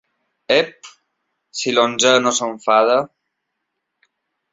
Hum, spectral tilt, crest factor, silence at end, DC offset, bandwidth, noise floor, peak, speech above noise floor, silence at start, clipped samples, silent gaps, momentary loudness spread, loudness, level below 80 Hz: none; -2 dB/octave; 18 dB; 1.45 s; under 0.1%; 7.8 kHz; -76 dBFS; -2 dBFS; 60 dB; 0.5 s; under 0.1%; none; 13 LU; -17 LUFS; -66 dBFS